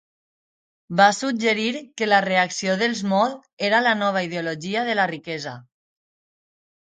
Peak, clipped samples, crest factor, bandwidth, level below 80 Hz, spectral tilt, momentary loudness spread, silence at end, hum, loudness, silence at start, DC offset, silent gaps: -4 dBFS; under 0.1%; 20 dB; 9.4 kHz; -72 dBFS; -4 dB/octave; 10 LU; 1.3 s; none; -21 LUFS; 0.9 s; under 0.1%; 3.53-3.57 s